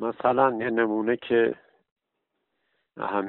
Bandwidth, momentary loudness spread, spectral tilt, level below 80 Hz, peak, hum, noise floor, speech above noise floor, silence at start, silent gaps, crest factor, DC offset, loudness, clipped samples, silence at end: 4.2 kHz; 9 LU; -4 dB/octave; -68 dBFS; -6 dBFS; none; -80 dBFS; 56 dB; 0 s; 1.92-1.96 s; 20 dB; under 0.1%; -25 LUFS; under 0.1%; 0 s